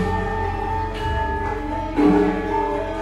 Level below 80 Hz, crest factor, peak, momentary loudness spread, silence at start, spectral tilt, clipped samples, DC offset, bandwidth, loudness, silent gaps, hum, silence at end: -32 dBFS; 16 dB; -6 dBFS; 8 LU; 0 s; -7.5 dB/octave; under 0.1%; under 0.1%; 11.5 kHz; -22 LUFS; none; none; 0 s